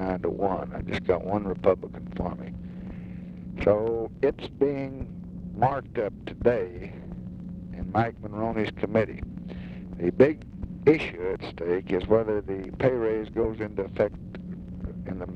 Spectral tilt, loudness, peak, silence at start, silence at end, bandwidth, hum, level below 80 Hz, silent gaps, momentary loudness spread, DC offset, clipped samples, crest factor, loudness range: -9 dB/octave; -28 LUFS; -6 dBFS; 0 s; 0 s; 7.8 kHz; none; -46 dBFS; none; 15 LU; under 0.1%; under 0.1%; 22 dB; 4 LU